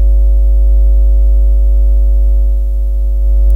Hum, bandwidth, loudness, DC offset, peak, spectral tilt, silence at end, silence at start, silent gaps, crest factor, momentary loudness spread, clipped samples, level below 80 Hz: none; 0.7 kHz; -13 LUFS; under 0.1%; -2 dBFS; -10.5 dB/octave; 0 s; 0 s; none; 6 dB; 4 LU; under 0.1%; -8 dBFS